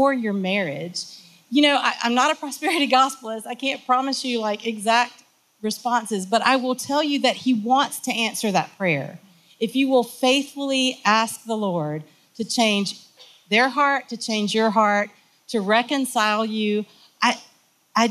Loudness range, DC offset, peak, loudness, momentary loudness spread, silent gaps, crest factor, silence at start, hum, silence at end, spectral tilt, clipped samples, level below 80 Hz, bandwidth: 2 LU; under 0.1%; -4 dBFS; -22 LUFS; 11 LU; none; 18 dB; 0 s; none; 0 s; -3.5 dB/octave; under 0.1%; -80 dBFS; 15.5 kHz